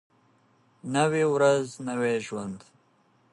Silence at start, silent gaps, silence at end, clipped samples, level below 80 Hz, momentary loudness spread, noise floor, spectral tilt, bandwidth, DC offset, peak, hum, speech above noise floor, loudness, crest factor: 0.85 s; none; 0.75 s; under 0.1%; -72 dBFS; 17 LU; -65 dBFS; -5.5 dB/octave; 11.5 kHz; under 0.1%; -10 dBFS; none; 39 dB; -26 LUFS; 18 dB